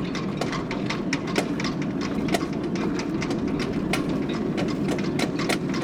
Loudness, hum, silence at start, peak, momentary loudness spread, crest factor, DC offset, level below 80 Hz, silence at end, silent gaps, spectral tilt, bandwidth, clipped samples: -26 LUFS; none; 0 s; -6 dBFS; 2 LU; 18 dB; under 0.1%; -46 dBFS; 0 s; none; -5.5 dB/octave; 17.5 kHz; under 0.1%